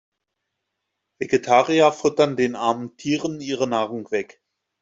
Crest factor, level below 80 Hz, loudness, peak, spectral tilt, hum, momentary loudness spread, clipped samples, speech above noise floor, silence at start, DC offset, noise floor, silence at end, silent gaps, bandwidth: 20 dB; -64 dBFS; -21 LUFS; -2 dBFS; -5 dB/octave; none; 10 LU; under 0.1%; 59 dB; 1.2 s; under 0.1%; -80 dBFS; 0.6 s; none; 7.8 kHz